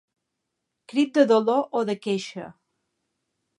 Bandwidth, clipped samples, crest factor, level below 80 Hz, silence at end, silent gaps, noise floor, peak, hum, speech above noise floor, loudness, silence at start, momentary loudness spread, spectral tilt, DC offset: 11 kHz; under 0.1%; 22 dB; -78 dBFS; 1.05 s; none; -81 dBFS; -4 dBFS; none; 58 dB; -23 LUFS; 0.9 s; 18 LU; -5.5 dB/octave; under 0.1%